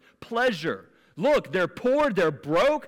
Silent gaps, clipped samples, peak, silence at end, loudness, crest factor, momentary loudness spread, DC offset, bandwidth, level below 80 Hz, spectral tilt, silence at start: none; under 0.1%; -16 dBFS; 0 s; -25 LUFS; 8 dB; 9 LU; under 0.1%; 16.5 kHz; -56 dBFS; -5.5 dB/octave; 0.2 s